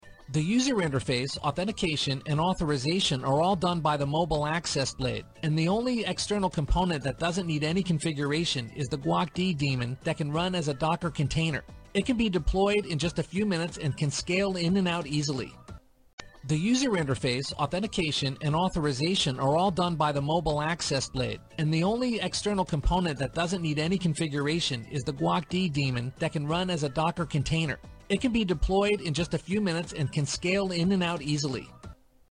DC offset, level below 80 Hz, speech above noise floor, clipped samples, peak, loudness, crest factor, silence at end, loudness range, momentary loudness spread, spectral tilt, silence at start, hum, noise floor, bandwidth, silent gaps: under 0.1%; -44 dBFS; 21 dB; under 0.1%; -14 dBFS; -28 LUFS; 14 dB; 0.35 s; 2 LU; 6 LU; -5 dB/octave; 0.05 s; none; -49 dBFS; 11 kHz; 16.13-16.18 s